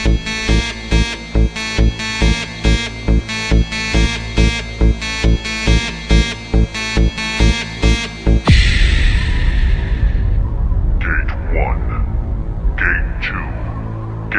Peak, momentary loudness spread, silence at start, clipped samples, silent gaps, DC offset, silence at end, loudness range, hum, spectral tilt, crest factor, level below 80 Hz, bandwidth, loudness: 0 dBFS; 6 LU; 0 s; under 0.1%; none; under 0.1%; 0 s; 4 LU; none; -5 dB/octave; 14 dB; -16 dBFS; 10 kHz; -17 LUFS